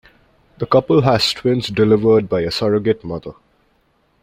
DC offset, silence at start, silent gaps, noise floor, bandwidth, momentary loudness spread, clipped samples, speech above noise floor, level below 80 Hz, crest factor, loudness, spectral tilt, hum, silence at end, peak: under 0.1%; 0.6 s; none; -60 dBFS; 15.5 kHz; 15 LU; under 0.1%; 45 dB; -48 dBFS; 16 dB; -16 LUFS; -6 dB/octave; none; 0.9 s; -2 dBFS